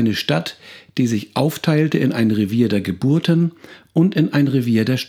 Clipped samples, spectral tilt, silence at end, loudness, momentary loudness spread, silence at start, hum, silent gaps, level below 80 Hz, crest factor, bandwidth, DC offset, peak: under 0.1%; -7 dB/octave; 0 s; -18 LUFS; 6 LU; 0 s; none; none; -60 dBFS; 16 dB; 16 kHz; under 0.1%; -2 dBFS